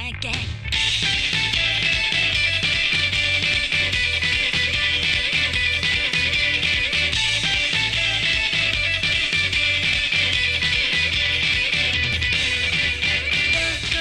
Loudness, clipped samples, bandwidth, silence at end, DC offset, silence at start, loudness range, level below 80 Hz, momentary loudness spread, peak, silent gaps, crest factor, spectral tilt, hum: -18 LUFS; under 0.1%; 13.5 kHz; 0 s; under 0.1%; 0 s; 0 LU; -36 dBFS; 1 LU; -4 dBFS; none; 16 dB; -2 dB/octave; none